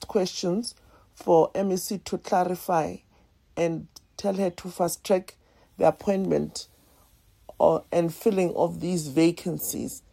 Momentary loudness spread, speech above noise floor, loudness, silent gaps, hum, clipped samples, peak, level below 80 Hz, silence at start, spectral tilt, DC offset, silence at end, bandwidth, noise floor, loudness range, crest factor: 12 LU; 35 dB; -26 LUFS; none; none; under 0.1%; -4 dBFS; -58 dBFS; 0 s; -5.5 dB/octave; under 0.1%; 0.15 s; 16 kHz; -60 dBFS; 3 LU; 22 dB